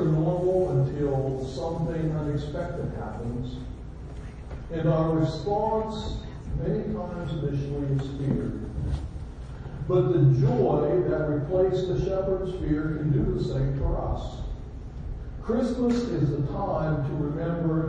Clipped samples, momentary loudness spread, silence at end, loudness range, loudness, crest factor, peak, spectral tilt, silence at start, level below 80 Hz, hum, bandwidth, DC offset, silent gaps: under 0.1%; 15 LU; 0 s; 6 LU; -27 LUFS; 16 dB; -12 dBFS; -9 dB/octave; 0 s; -38 dBFS; none; 8.6 kHz; under 0.1%; none